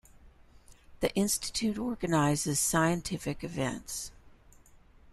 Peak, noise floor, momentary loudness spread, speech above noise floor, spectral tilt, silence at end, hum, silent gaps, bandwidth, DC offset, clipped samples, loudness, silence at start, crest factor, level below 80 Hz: -12 dBFS; -57 dBFS; 10 LU; 27 dB; -4 dB/octave; 0.35 s; none; none; 14.5 kHz; under 0.1%; under 0.1%; -30 LUFS; 0.15 s; 22 dB; -54 dBFS